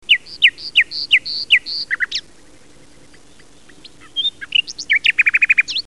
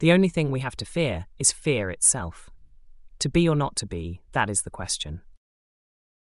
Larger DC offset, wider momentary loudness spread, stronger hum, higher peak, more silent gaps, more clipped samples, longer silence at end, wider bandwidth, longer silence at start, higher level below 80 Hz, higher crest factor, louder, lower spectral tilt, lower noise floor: first, 0.7% vs under 0.1%; second, 8 LU vs 12 LU; neither; first, -2 dBFS vs -6 dBFS; neither; neither; second, 0.15 s vs 1 s; about the same, 11.5 kHz vs 11.5 kHz; about the same, 0.1 s vs 0 s; second, -56 dBFS vs -46 dBFS; about the same, 18 dB vs 20 dB; first, -15 LUFS vs -24 LUFS; second, 1.5 dB/octave vs -4 dB/octave; about the same, -48 dBFS vs -47 dBFS